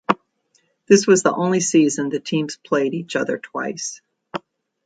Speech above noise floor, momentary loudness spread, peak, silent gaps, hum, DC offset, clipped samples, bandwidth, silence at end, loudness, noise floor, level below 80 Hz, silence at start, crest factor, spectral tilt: 46 dB; 17 LU; 0 dBFS; none; none; under 0.1%; under 0.1%; 9.4 kHz; 0.45 s; -19 LUFS; -64 dBFS; -66 dBFS; 0.1 s; 20 dB; -4.5 dB/octave